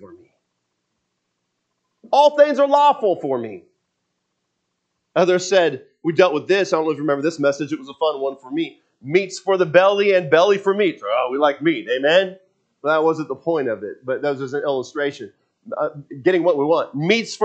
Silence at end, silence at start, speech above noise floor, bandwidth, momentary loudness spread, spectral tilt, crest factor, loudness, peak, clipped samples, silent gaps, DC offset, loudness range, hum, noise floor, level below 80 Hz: 0 s; 0 s; 56 dB; 8.6 kHz; 12 LU; -5 dB/octave; 20 dB; -19 LUFS; 0 dBFS; under 0.1%; none; under 0.1%; 5 LU; none; -75 dBFS; -76 dBFS